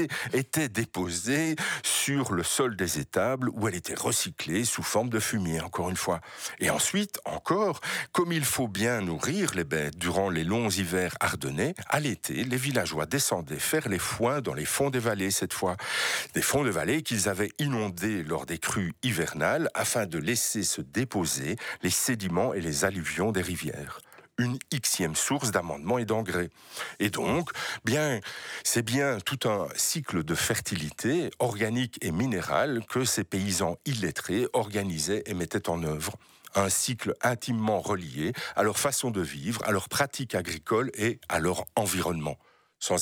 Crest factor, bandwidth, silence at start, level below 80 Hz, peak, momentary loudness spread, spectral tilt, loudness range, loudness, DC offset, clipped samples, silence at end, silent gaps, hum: 20 dB; 19.5 kHz; 0 s; -56 dBFS; -10 dBFS; 5 LU; -3.5 dB/octave; 2 LU; -28 LUFS; under 0.1%; under 0.1%; 0 s; none; none